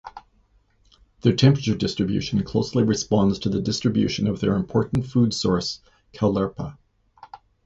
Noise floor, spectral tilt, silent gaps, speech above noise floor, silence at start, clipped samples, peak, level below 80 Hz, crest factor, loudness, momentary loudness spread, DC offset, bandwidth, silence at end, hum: -61 dBFS; -6.5 dB/octave; none; 40 dB; 0.05 s; under 0.1%; -4 dBFS; -46 dBFS; 20 dB; -22 LUFS; 8 LU; under 0.1%; 8 kHz; 0.3 s; none